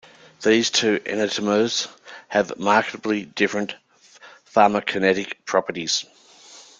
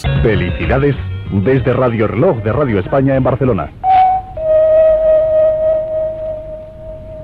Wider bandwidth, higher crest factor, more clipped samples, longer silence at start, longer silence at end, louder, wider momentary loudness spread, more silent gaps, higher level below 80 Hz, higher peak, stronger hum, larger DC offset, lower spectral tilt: first, 9.6 kHz vs 4.9 kHz; first, 20 dB vs 10 dB; neither; first, 0.4 s vs 0 s; first, 0.2 s vs 0 s; second, -21 LUFS vs -13 LUFS; second, 9 LU vs 13 LU; neither; second, -64 dBFS vs -30 dBFS; about the same, -2 dBFS vs -2 dBFS; neither; neither; second, -3 dB/octave vs -9.5 dB/octave